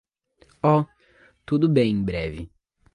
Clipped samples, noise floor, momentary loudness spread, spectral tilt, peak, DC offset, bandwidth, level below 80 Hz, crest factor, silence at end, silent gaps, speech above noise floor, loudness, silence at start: under 0.1%; -60 dBFS; 16 LU; -9 dB/octave; -6 dBFS; under 0.1%; 10 kHz; -46 dBFS; 18 dB; 0.5 s; none; 39 dB; -23 LUFS; 0.65 s